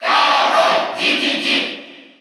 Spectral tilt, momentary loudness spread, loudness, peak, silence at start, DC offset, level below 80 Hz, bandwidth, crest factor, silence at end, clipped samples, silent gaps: -1.5 dB/octave; 7 LU; -15 LUFS; -2 dBFS; 0 s; under 0.1%; -80 dBFS; 14.5 kHz; 14 dB; 0.2 s; under 0.1%; none